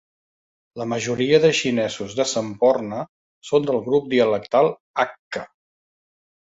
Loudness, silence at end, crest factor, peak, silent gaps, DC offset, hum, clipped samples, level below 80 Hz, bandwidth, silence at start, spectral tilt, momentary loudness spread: -21 LUFS; 1 s; 20 dB; -2 dBFS; 3.09-3.42 s, 4.80-4.94 s, 5.19-5.31 s; under 0.1%; none; under 0.1%; -62 dBFS; 8 kHz; 0.75 s; -4.5 dB/octave; 15 LU